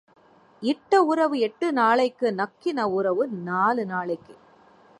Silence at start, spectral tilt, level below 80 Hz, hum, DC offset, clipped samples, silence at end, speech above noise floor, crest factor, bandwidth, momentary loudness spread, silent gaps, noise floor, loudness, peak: 0.6 s; -6 dB/octave; -74 dBFS; none; under 0.1%; under 0.1%; 0.65 s; 31 dB; 18 dB; 11.5 kHz; 8 LU; none; -54 dBFS; -24 LUFS; -6 dBFS